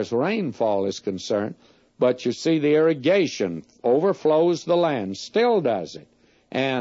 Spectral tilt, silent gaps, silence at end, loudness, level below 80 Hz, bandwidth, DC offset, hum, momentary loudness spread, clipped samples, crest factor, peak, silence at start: -5.5 dB/octave; none; 0 s; -22 LUFS; -68 dBFS; 8 kHz; under 0.1%; none; 9 LU; under 0.1%; 14 dB; -8 dBFS; 0 s